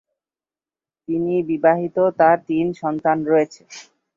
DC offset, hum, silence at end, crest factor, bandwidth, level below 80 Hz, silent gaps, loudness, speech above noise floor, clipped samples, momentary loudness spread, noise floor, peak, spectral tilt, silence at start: under 0.1%; none; 0.35 s; 18 dB; 7.6 kHz; -64 dBFS; none; -19 LUFS; over 71 dB; under 0.1%; 12 LU; under -90 dBFS; -2 dBFS; -7 dB/octave; 1.1 s